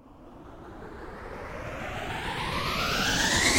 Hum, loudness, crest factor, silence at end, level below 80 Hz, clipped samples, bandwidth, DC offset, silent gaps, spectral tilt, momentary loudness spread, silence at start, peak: none; -28 LUFS; 20 dB; 0 s; -44 dBFS; under 0.1%; 16 kHz; under 0.1%; none; -2.5 dB/octave; 22 LU; 0.05 s; -10 dBFS